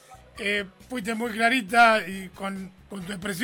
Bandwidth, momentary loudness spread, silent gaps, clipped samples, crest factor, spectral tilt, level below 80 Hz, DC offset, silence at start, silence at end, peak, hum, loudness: 17 kHz; 18 LU; none; under 0.1%; 20 dB; -4 dB/octave; -56 dBFS; under 0.1%; 0.1 s; 0 s; -6 dBFS; none; -24 LUFS